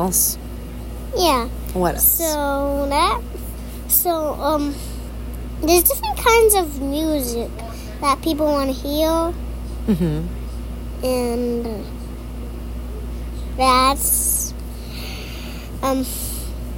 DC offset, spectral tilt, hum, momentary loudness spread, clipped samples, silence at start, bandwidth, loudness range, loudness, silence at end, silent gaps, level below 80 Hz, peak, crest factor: under 0.1%; -4 dB/octave; none; 17 LU; under 0.1%; 0 s; 16.5 kHz; 6 LU; -19 LUFS; 0 s; none; -30 dBFS; -2 dBFS; 20 dB